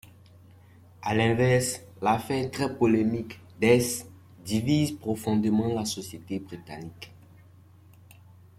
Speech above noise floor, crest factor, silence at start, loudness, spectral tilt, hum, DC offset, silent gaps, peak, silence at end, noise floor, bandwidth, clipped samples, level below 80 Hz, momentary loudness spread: 28 dB; 22 dB; 1 s; -26 LUFS; -5.5 dB/octave; none; under 0.1%; none; -6 dBFS; 1.5 s; -53 dBFS; 16 kHz; under 0.1%; -58 dBFS; 18 LU